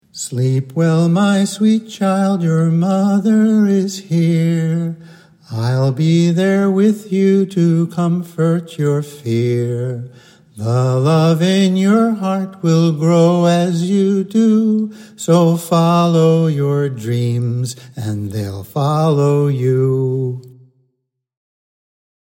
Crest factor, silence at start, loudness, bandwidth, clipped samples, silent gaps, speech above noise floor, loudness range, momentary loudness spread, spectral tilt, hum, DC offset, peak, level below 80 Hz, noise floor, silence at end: 14 dB; 0.15 s; -15 LUFS; 16 kHz; under 0.1%; none; 57 dB; 4 LU; 10 LU; -7.5 dB/octave; none; under 0.1%; -2 dBFS; -66 dBFS; -72 dBFS; 1.85 s